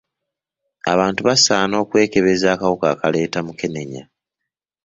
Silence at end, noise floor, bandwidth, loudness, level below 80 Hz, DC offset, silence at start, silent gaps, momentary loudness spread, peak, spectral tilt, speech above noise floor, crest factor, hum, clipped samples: 0.8 s; -83 dBFS; 8 kHz; -17 LUFS; -54 dBFS; under 0.1%; 0.85 s; none; 13 LU; 0 dBFS; -3.5 dB/octave; 65 dB; 18 dB; none; under 0.1%